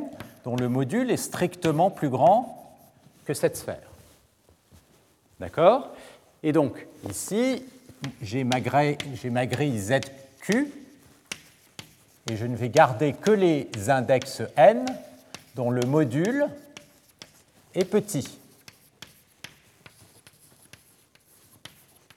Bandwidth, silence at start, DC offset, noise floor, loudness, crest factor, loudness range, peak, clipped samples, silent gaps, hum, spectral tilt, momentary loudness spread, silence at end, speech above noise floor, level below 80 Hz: 17 kHz; 0 s; under 0.1%; -61 dBFS; -25 LUFS; 22 dB; 10 LU; -4 dBFS; under 0.1%; none; none; -5.5 dB/octave; 20 LU; 3.8 s; 37 dB; -68 dBFS